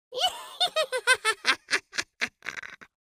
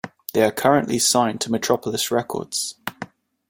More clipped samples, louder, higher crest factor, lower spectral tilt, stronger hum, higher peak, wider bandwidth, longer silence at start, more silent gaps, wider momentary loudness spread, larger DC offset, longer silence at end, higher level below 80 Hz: neither; second, -26 LUFS vs -21 LUFS; first, 26 dB vs 20 dB; second, 1 dB/octave vs -3 dB/octave; neither; about the same, -4 dBFS vs -2 dBFS; about the same, 15.5 kHz vs 16.5 kHz; about the same, 0.1 s vs 0.05 s; neither; about the same, 14 LU vs 15 LU; neither; second, 0.2 s vs 0.45 s; second, -72 dBFS vs -60 dBFS